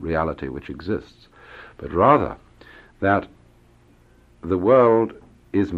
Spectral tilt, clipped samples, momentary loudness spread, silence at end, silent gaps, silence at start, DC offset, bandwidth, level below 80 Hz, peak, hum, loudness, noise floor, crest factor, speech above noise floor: -9 dB/octave; under 0.1%; 22 LU; 0 s; none; 0 s; under 0.1%; 6.8 kHz; -46 dBFS; -2 dBFS; none; -21 LUFS; -54 dBFS; 20 dB; 34 dB